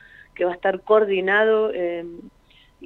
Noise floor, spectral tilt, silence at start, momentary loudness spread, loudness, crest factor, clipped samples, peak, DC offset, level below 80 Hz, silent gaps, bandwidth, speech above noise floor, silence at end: -50 dBFS; -7 dB/octave; 0.4 s; 10 LU; -20 LUFS; 18 dB; under 0.1%; -4 dBFS; under 0.1%; -60 dBFS; none; 4.2 kHz; 29 dB; 0 s